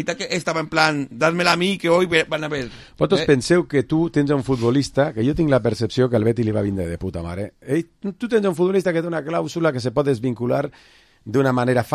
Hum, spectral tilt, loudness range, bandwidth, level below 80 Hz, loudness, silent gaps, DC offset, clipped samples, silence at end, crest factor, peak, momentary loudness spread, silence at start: none; -6 dB/octave; 3 LU; 14.5 kHz; -46 dBFS; -20 LUFS; none; under 0.1%; under 0.1%; 0 s; 20 dB; 0 dBFS; 9 LU; 0 s